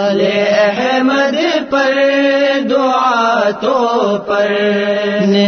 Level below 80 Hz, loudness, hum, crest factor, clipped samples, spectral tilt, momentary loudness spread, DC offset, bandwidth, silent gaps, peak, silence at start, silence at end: -58 dBFS; -13 LUFS; none; 12 dB; under 0.1%; -5 dB/octave; 3 LU; under 0.1%; 6.6 kHz; none; -2 dBFS; 0 s; 0 s